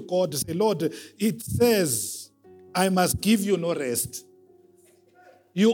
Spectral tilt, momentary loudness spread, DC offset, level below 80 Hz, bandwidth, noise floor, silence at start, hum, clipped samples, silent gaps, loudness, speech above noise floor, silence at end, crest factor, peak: -4.5 dB/octave; 11 LU; under 0.1%; -56 dBFS; 18.5 kHz; -58 dBFS; 0 s; none; under 0.1%; none; -25 LUFS; 34 dB; 0 s; 18 dB; -8 dBFS